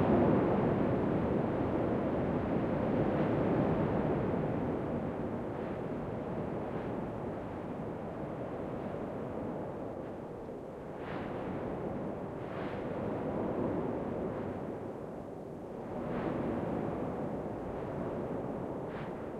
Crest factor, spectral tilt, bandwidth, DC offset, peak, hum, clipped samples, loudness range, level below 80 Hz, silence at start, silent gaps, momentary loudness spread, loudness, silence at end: 16 dB; -9.5 dB/octave; 11 kHz; under 0.1%; -18 dBFS; none; under 0.1%; 8 LU; -54 dBFS; 0 s; none; 11 LU; -36 LUFS; 0 s